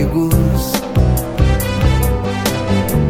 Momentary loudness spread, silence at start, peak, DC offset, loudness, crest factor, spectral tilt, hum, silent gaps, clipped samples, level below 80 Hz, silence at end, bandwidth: 3 LU; 0 s; 0 dBFS; under 0.1%; -16 LUFS; 14 dB; -6 dB/octave; none; none; under 0.1%; -20 dBFS; 0 s; 17.5 kHz